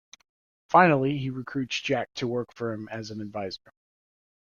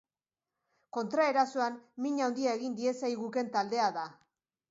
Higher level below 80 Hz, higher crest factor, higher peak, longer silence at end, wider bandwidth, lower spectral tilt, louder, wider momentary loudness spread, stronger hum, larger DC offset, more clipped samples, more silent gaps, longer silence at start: first, -64 dBFS vs -86 dBFS; about the same, 22 dB vs 18 dB; first, -6 dBFS vs -16 dBFS; first, 0.95 s vs 0.55 s; about the same, 7.2 kHz vs 7.8 kHz; first, -6 dB/octave vs -4 dB/octave; first, -27 LUFS vs -32 LUFS; first, 16 LU vs 10 LU; neither; neither; neither; neither; second, 0.7 s vs 0.95 s